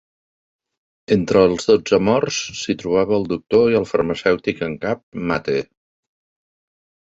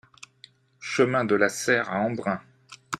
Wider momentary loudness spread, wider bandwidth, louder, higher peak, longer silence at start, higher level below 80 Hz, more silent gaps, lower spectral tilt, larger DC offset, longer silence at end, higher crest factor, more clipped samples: about the same, 9 LU vs 9 LU; second, 8 kHz vs 14.5 kHz; first, -19 LUFS vs -25 LUFS; first, -2 dBFS vs -8 dBFS; first, 1.1 s vs 0.8 s; first, -50 dBFS vs -68 dBFS; first, 5.03-5.12 s vs none; about the same, -5 dB/octave vs -4.5 dB/octave; neither; first, 1.5 s vs 0.05 s; about the same, 18 dB vs 20 dB; neither